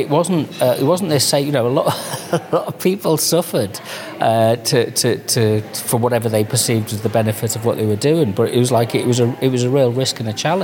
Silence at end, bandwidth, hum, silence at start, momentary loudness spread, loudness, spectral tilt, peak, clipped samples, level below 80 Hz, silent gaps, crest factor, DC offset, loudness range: 0 s; 17.5 kHz; none; 0 s; 5 LU; -17 LUFS; -5 dB/octave; -2 dBFS; under 0.1%; -62 dBFS; none; 14 dB; under 0.1%; 1 LU